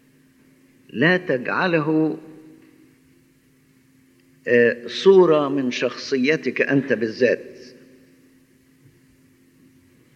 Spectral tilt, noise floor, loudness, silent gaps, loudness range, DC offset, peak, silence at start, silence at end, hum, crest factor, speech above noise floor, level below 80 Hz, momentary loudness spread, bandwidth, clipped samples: -6 dB/octave; -57 dBFS; -19 LUFS; none; 7 LU; under 0.1%; -2 dBFS; 0.95 s; 2.45 s; none; 20 dB; 39 dB; -74 dBFS; 11 LU; 7.8 kHz; under 0.1%